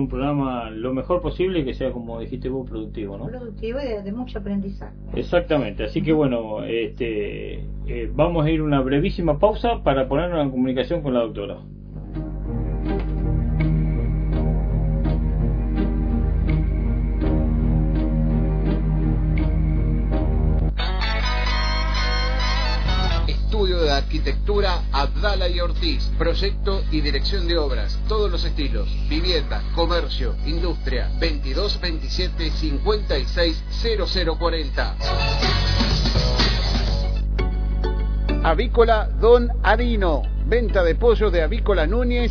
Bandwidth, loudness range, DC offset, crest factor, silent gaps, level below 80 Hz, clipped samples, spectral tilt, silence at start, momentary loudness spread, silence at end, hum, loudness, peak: 5.4 kHz; 5 LU; under 0.1%; 18 dB; none; -24 dBFS; under 0.1%; -6.5 dB/octave; 0 s; 9 LU; 0 s; 50 Hz at -25 dBFS; -22 LUFS; -2 dBFS